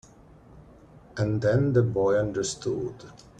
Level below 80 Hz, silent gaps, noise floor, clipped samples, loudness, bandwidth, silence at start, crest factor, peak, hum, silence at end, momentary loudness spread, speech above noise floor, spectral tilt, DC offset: -54 dBFS; none; -52 dBFS; under 0.1%; -26 LUFS; 10 kHz; 0.55 s; 18 dB; -8 dBFS; none; 0.3 s; 14 LU; 27 dB; -6.5 dB/octave; under 0.1%